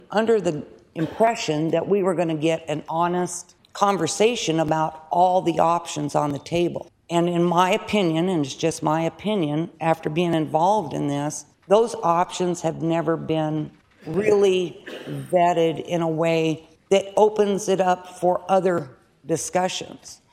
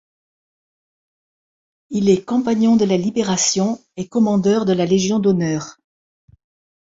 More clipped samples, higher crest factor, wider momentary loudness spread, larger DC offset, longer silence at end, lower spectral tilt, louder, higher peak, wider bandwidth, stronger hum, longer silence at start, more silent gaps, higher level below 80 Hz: neither; about the same, 20 dB vs 16 dB; about the same, 10 LU vs 9 LU; neither; second, 0.15 s vs 1.2 s; about the same, -5.5 dB/octave vs -5 dB/octave; second, -22 LUFS vs -18 LUFS; about the same, -2 dBFS vs -4 dBFS; first, 14.5 kHz vs 7.8 kHz; neither; second, 0.1 s vs 1.9 s; neither; about the same, -60 dBFS vs -58 dBFS